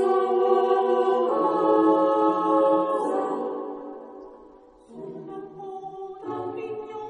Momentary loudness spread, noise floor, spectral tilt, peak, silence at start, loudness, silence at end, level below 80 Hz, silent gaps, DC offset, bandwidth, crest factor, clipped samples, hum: 19 LU; -50 dBFS; -7 dB/octave; -8 dBFS; 0 s; -23 LUFS; 0 s; -72 dBFS; none; under 0.1%; 10 kHz; 16 dB; under 0.1%; none